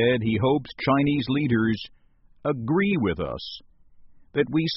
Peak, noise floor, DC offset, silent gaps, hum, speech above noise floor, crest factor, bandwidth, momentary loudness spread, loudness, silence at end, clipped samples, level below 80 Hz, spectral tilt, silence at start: -8 dBFS; -50 dBFS; under 0.1%; none; none; 26 dB; 16 dB; 5.8 kHz; 11 LU; -25 LUFS; 0 s; under 0.1%; -50 dBFS; -5.5 dB/octave; 0 s